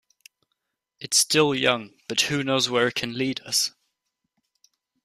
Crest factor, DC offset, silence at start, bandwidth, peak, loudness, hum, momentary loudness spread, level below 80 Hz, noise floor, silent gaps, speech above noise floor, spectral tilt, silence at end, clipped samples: 22 dB; under 0.1%; 1 s; 15.5 kHz; -4 dBFS; -22 LUFS; none; 9 LU; -66 dBFS; -80 dBFS; none; 56 dB; -2.5 dB/octave; 1.35 s; under 0.1%